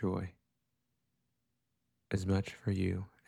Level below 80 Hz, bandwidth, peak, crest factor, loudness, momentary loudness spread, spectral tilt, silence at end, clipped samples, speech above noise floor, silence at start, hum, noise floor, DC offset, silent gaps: -62 dBFS; 11.5 kHz; -20 dBFS; 18 dB; -36 LUFS; 7 LU; -7.5 dB/octave; 0.2 s; under 0.1%; 49 dB; 0 s; none; -84 dBFS; under 0.1%; none